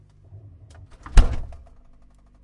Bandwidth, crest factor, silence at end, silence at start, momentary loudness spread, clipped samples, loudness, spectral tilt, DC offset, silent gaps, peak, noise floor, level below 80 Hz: 11 kHz; 22 dB; 0.9 s; 1.15 s; 26 LU; under 0.1%; -24 LUFS; -5.5 dB/octave; under 0.1%; none; 0 dBFS; -52 dBFS; -24 dBFS